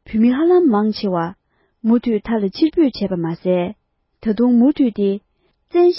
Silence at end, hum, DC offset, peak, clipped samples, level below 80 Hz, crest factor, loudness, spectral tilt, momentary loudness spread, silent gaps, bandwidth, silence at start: 0 s; none; under 0.1%; -6 dBFS; under 0.1%; -50 dBFS; 12 dB; -17 LUFS; -11.5 dB/octave; 9 LU; none; 5.8 kHz; 0.1 s